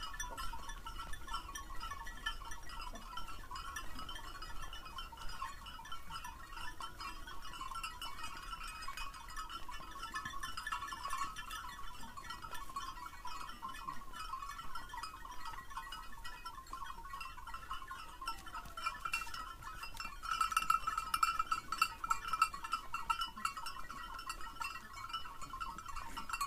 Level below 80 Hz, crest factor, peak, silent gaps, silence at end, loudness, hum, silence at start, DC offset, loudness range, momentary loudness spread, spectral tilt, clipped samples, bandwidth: -52 dBFS; 26 dB; -16 dBFS; none; 0 s; -43 LUFS; none; 0 s; under 0.1%; 11 LU; 13 LU; -1.5 dB/octave; under 0.1%; 15.5 kHz